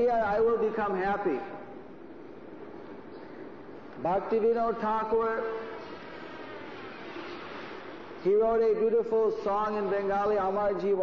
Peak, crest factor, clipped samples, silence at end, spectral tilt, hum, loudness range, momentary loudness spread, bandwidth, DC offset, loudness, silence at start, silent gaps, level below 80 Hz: -18 dBFS; 12 dB; under 0.1%; 0 s; -7.5 dB/octave; none; 8 LU; 19 LU; 6.4 kHz; 0.3%; -28 LUFS; 0 s; none; -58 dBFS